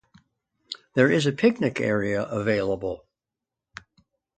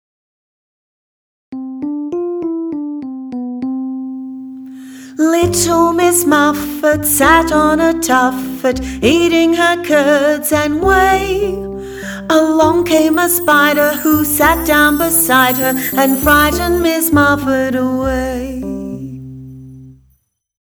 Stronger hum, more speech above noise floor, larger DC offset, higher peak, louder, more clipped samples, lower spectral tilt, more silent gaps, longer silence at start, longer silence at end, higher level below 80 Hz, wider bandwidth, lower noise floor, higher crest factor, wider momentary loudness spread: neither; first, 64 dB vs 46 dB; neither; second, -6 dBFS vs 0 dBFS; second, -24 LUFS vs -13 LUFS; neither; first, -6 dB/octave vs -3.5 dB/octave; neither; second, 0.7 s vs 1.5 s; first, 1.4 s vs 0.7 s; second, -58 dBFS vs -34 dBFS; second, 9.2 kHz vs over 20 kHz; first, -87 dBFS vs -58 dBFS; first, 20 dB vs 14 dB; first, 25 LU vs 15 LU